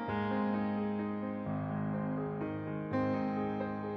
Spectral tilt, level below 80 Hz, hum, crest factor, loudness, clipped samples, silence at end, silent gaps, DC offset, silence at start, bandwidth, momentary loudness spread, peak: -10 dB/octave; -64 dBFS; none; 12 dB; -36 LUFS; under 0.1%; 0 s; none; under 0.1%; 0 s; 5.4 kHz; 5 LU; -22 dBFS